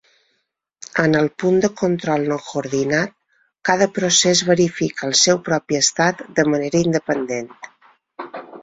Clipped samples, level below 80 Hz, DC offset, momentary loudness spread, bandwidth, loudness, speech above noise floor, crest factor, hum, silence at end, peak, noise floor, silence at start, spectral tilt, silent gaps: under 0.1%; -58 dBFS; under 0.1%; 12 LU; 8 kHz; -18 LUFS; 53 dB; 18 dB; none; 0 s; -2 dBFS; -72 dBFS; 0.95 s; -3.5 dB/octave; none